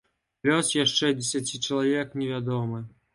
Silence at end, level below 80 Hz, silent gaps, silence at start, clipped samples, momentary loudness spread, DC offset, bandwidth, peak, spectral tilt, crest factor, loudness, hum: 0.25 s; -66 dBFS; none; 0.45 s; under 0.1%; 8 LU; under 0.1%; 11.5 kHz; -8 dBFS; -3.5 dB/octave; 18 dB; -26 LUFS; none